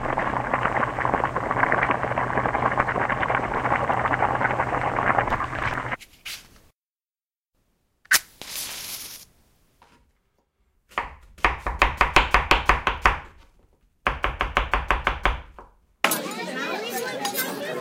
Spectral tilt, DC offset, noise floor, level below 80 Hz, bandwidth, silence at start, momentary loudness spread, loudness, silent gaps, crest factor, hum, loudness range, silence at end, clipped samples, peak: -3.5 dB/octave; under 0.1%; under -90 dBFS; -36 dBFS; 16.5 kHz; 0 s; 13 LU; -24 LUFS; none; 24 dB; none; 7 LU; 0 s; under 0.1%; -2 dBFS